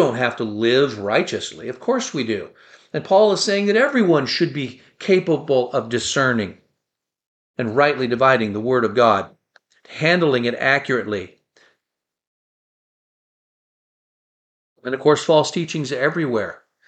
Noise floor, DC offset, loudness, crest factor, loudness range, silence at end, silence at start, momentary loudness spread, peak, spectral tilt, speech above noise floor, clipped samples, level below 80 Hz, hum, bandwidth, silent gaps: -82 dBFS; under 0.1%; -19 LUFS; 18 dB; 5 LU; 0.3 s; 0 s; 13 LU; -2 dBFS; -4.5 dB/octave; 64 dB; under 0.1%; -64 dBFS; none; 9.2 kHz; 7.26-7.54 s, 12.27-14.76 s